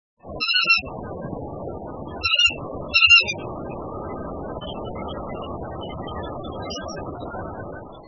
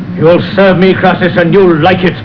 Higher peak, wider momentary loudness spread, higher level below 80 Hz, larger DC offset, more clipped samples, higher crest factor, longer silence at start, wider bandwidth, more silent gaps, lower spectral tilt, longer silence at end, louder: second, -4 dBFS vs 0 dBFS; first, 18 LU vs 2 LU; second, -44 dBFS vs -36 dBFS; second, 0.2% vs 1%; neither; first, 22 dB vs 8 dB; first, 0.25 s vs 0 s; first, 7.4 kHz vs 5.4 kHz; neither; second, -3 dB/octave vs -9 dB/octave; about the same, 0 s vs 0 s; second, -19 LUFS vs -7 LUFS